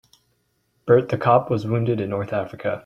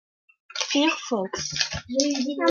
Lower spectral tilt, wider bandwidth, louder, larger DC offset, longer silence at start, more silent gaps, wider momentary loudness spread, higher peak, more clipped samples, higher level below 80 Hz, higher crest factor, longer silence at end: first, -9 dB/octave vs -2.5 dB/octave; about the same, 6.8 kHz vs 7.4 kHz; first, -21 LUFS vs -25 LUFS; neither; first, 0.85 s vs 0.55 s; neither; about the same, 9 LU vs 7 LU; about the same, -2 dBFS vs -4 dBFS; neither; about the same, -58 dBFS vs -56 dBFS; about the same, 20 dB vs 22 dB; about the same, 0.05 s vs 0 s